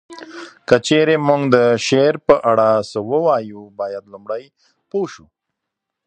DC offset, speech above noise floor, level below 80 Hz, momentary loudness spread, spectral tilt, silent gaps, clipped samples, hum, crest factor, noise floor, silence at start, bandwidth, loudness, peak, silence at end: under 0.1%; 63 dB; -56 dBFS; 18 LU; -5.5 dB/octave; none; under 0.1%; none; 18 dB; -80 dBFS; 0.1 s; 9.6 kHz; -16 LUFS; 0 dBFS; 0.9 s